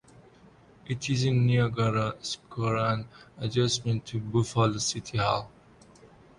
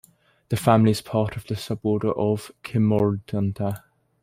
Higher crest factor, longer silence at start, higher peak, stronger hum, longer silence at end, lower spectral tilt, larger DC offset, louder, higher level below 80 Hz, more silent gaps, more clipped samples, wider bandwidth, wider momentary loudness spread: about the same, 18 dB vs 20 dB; first, 0.85 s vs 0.5 s; second, -10 dBFS vs -2 dBFS; neither; second, 0.3 s vs 0.45 s; second, -5 dB/octave vs -7.5 dB/octave; neither; second, -28 LUFS vs -23 LUFS; about the same, -56 dBFS vs -54 dBFS; neither; neither; second, 11.5 kHz vs 16 kHz; about the same, 10 LU vs 11 LU